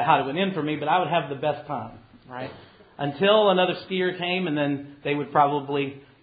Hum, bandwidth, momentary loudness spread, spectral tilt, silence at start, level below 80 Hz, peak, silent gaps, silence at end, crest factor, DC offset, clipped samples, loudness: none; 5 kHz; 15 LU; -10 dB/octave; 0 s; -64 dBFS; -6 dBFS; none; 0.2 s; 20 dB; under 0.1%; under 0.1%; -24 LUFS